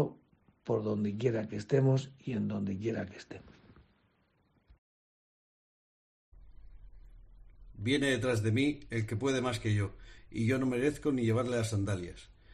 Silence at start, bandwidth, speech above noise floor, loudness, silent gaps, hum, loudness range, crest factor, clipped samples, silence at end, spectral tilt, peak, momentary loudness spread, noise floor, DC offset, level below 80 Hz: 0 s; 13 kHz; 41 dB; -33 LUFS; 4.78-6.32 s; none; 9 LU; 20 dB; under 0.1%; 0.3 s; -6.5 dB/octave; -14 dBFS; 12 LU; -73 dBFS; under 0.1%; -58 dBFS